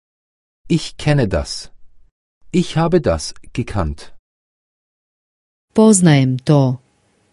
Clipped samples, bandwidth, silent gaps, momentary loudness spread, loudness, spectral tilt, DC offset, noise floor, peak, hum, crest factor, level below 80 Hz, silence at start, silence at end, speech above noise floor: under 0.1%; 11.5 kHz; 2.11-2.41 s, 4.19-5.68 s; 15 LU; -16 LUFS; -6 dB/octave; under 0.1%; -59 dBFS; 0 dBFS; none; 18 dB; -36 dBFS; 0.65 s; 0.55 s; 44 dB